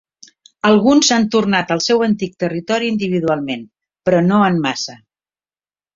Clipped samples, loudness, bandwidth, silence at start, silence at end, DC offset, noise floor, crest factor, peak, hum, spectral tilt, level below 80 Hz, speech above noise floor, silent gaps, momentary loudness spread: under 0.1%; -16 LUFS; 7.6 kHz; 0.65 s; 1 s; under 0.1%; under -90 dBFS; 16 dB; -2 dBFS; none; -4.5 dB/octave; -56 dBFS; over 75 dB; none; 11 LU